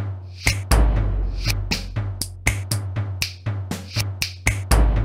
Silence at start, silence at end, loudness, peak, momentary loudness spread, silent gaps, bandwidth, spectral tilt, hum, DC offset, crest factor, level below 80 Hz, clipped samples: 0 s; 0 s; -24 LUFS; -2 dBFS; 9 LU; none; 16.5 kHz; -4 dB/octave; none; under 0.1%; 20 dB; -24 dBFS; under 0.1%